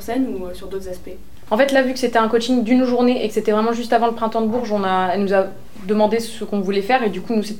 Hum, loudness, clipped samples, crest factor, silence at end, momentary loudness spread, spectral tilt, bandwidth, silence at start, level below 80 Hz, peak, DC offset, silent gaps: none; -19 LUFS; under 0.1%; 16 dB; 0 s; 13 LU; -5.5 dB/octave; 17 kHz; 0 s; -48 dBFS; -2 dBFS; 3%; none